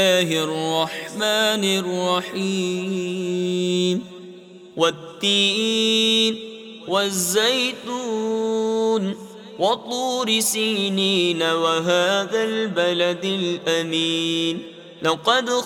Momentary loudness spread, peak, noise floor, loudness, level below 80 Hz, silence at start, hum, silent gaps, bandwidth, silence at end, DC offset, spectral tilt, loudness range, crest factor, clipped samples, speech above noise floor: 8 LU; -4 dBFS; -42 dBFS; -21 LUFS; -70 dBFS; 0 s; none; none; 16.5 kHz; 0 s; under 0.1%; -3 dB/octave; 3 LU; 18 dB; under 0.1%; 21 dB